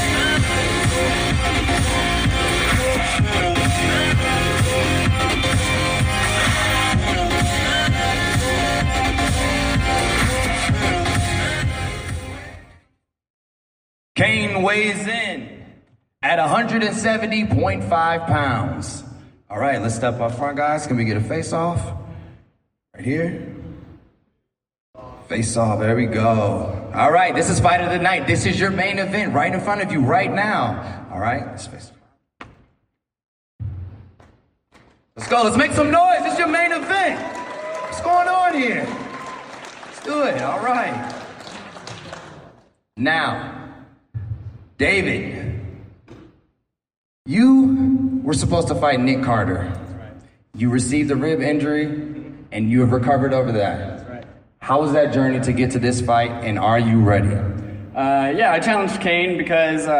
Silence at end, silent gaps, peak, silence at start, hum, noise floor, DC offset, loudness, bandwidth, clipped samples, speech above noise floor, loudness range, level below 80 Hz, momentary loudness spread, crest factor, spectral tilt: 0 s; 13.30-14.15 s, 24.80-24.93 s, 33.25-33.59 s, 46.97-47.25 s; -4 dBFS; 0 s; none; -75 dBFS; under 0.1%; -19 LUFS; 15.5 kHz; under 0.1%; 57 dB; 8 LU; -34 dBFS; 16 LU; 16 dB; -5 dB/octave